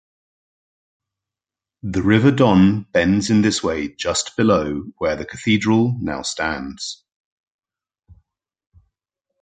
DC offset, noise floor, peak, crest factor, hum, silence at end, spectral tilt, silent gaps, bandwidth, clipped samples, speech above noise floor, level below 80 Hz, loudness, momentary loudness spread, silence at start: under 0.1%; -89 dBFS; -2 dBFS; 20 dB; none; 2.5 s; -5.5 dB/octave; none; 9.4 kHz; under 0.1%; 71 dB; -44 dBFS; -18 LUFS; 13 LU; 1.85 s